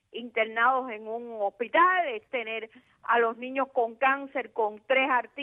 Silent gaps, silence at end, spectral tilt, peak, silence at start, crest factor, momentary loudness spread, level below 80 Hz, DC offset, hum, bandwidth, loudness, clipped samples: none; 0 s; -5.5 dB/octave; -10 dBFS; 0.15 s; 18 dB; 13 LU; -80 dBFS; under 0.1%; none; 3.9 kHz; -27 LUFS; under 0.1%